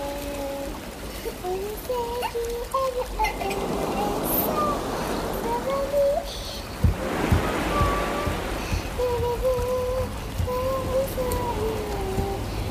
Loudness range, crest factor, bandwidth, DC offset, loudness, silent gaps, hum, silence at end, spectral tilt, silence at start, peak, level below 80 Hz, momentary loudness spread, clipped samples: 3 LU; 18 dB; 15.5 kHz; under 0.1%; -26 LUFS; none; none; 0 s; -5.5 dB/octave; 0 s; -8 dBFS; -34 dBFS; 8 LU; under 0.1%